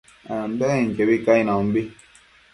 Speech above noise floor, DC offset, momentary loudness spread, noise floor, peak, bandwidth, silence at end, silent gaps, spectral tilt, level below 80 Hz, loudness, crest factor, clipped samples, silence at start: 32 dB; under 0.1%; 12 LU; -53 dBFS; -4 dBFS; 11.5 kHz; 0.6 s; none; -7 dB/octave; -54 dBFS; -21 LUFS; 18 dB; under 0.1%; 0.25 s